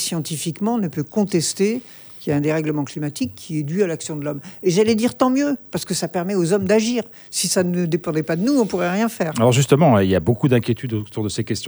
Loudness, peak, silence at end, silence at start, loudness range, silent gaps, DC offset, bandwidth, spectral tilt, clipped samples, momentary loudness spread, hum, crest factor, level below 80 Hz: -20 LUFS; -2 dBFS; 0 s; 0 s; 4 LU; none; under 0.1%; over 20 kHz; -5.5 dB/octave; under 0.1%; 9 LU; none; 18 dB; -56 dBFS